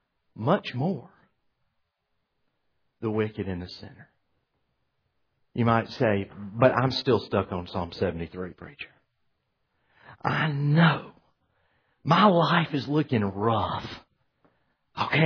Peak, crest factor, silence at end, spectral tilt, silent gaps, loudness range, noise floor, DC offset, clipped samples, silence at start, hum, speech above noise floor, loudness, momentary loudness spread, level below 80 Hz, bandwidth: -6 dBFS; 22 dB; 0 s; -8 dB/octave; none; 12 LU; -78 dBFS; under 0.1%; under 0.1%; 0.35 s; none; 53 dB; -26 LUFS; 18 LU; -58 dBFS; 5.4 kHz